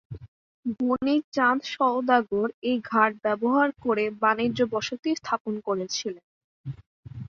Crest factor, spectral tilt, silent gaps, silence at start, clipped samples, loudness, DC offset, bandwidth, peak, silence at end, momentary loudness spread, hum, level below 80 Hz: 20 dB; -4.5 dB/octave; 0.28-0.63 s, 1.24-1.32 s, 2.54-2.62 s, 5.40-5.45 s, 6.24-6.64 s, 6.86-7.03 s; 0.1 s; under 0.1%; -25 LUFS; under 0.1%; 7.4 kHz; -6 dBFS; 0 s; 18 LU; none; -60 dBFS